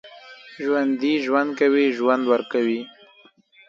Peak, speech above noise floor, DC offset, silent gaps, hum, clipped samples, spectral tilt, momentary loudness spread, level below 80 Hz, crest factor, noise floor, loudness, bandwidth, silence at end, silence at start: -4 dBFS; 34 dB; under 0.1%; none; none; under 0.1%; -5.5 dB/octave; 14 LU; -76 dBFS; 18 dB; -54 dBFS; -21 LUFS; 7.4 kHz; 0.8 s; 0.05 s